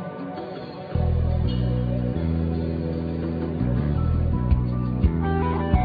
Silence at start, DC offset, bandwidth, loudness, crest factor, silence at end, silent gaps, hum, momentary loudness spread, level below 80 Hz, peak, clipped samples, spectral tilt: 0 s; under 0.1%; 4.9 kHz; -25 LUFS; 18 dB; 0 s; none; none; 9 LU; -28 dBFS; -6 dBFS; under 0.1%; -11.5 dB/octave